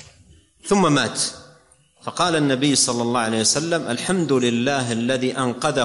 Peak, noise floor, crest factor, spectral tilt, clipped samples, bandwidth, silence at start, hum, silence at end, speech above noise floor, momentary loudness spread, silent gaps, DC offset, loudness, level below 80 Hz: -6 dBFS; -55 dBFS; 16 dB; -3.5 dB/octave; under 0.1%; 11.5 kHz; 0.65 s; none; 0 s; 35 dB; 6 LU; none; under 0.1%; -20 LUFS; -56 dBFS